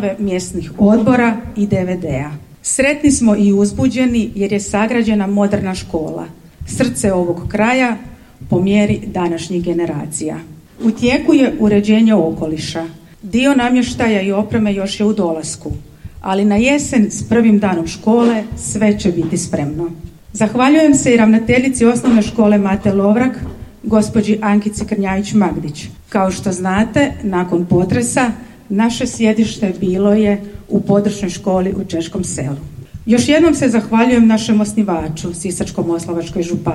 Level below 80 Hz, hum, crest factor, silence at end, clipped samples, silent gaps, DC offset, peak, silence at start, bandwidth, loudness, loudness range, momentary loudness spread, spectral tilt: -38 dBFS; none; 14 dB; 0 s; under 0.1%; none; 0.1%; 0 dBFS; 0 s; 12.5 kHz; -15 LUFS; 4 LU; 12 LU; -5.5 dB/octave